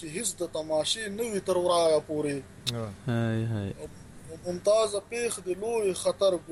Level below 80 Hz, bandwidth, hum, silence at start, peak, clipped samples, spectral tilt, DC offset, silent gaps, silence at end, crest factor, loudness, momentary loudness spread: -58 dBFS; 15 kHz; none; 0 s; -10 dBFS; under 0.1%; -4.5 dB/octave; under 0.1%; none; 0 s; 18 dB; -29 LUFS; 12 LU